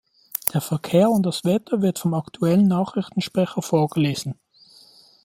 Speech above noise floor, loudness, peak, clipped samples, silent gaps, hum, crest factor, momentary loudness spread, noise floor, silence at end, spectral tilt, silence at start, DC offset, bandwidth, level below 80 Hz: 31 dB; -22 LUFS; 0 dBFS; under 0.1%; none; none; 22 dB; 8 LU; -52 dBFS; 0.9 s; -6.5 dB/octave; 0.45 s; under 0.1%; 16 kHz; -62 dBFS